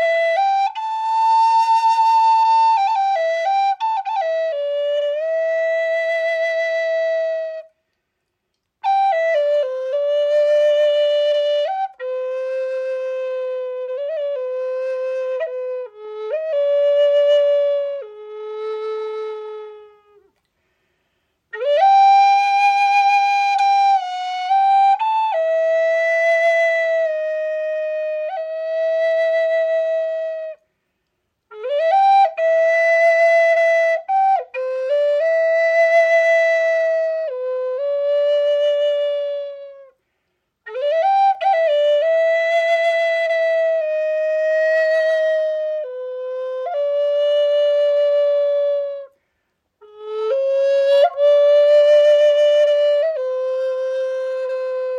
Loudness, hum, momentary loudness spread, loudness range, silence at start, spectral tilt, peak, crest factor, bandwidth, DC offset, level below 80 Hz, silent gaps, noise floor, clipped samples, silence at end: -17 LUFS; none; 12 LU; 7 LU; 0 s; 1 dB/octave; -6 dBFS; 12 dB; 9.8 kHz; under 0.1%; -82 dBFS; none; -75 dBFS; under 0.1%; 0 s